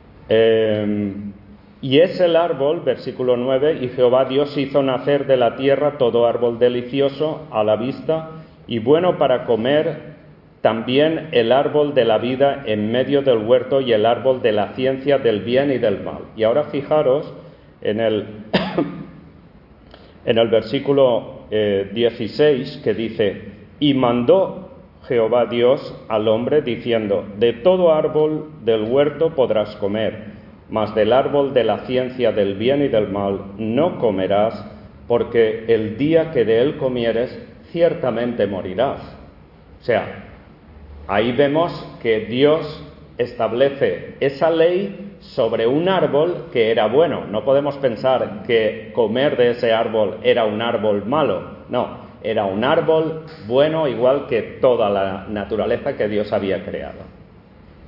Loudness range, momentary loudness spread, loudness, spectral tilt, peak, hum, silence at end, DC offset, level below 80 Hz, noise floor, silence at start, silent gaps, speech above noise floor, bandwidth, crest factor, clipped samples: 3 LU; 9 LU; -18 LUFS; -9 dB/octave; -2 dBFS; none; 0.65 s; under 0.1%; -52 dBFS; -46 dBFS; 0.3 s; none; 28 dB; 5.8 kHz; 16 dB; under 0.1%